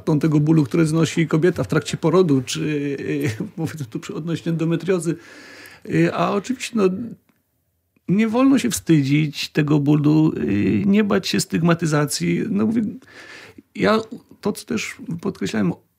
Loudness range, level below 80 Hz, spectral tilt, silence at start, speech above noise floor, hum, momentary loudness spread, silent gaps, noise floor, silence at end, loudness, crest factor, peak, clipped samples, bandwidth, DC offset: 6 LU; -56 dBFS; -6 dB/octave; 0.05 s; 49 dB; none; 13 LU; none; -69 dBFS; 0.25 s; -20 LUFS; 18 dB; -2 dBFS; under 0.1%; 16 kHz; under 0.1%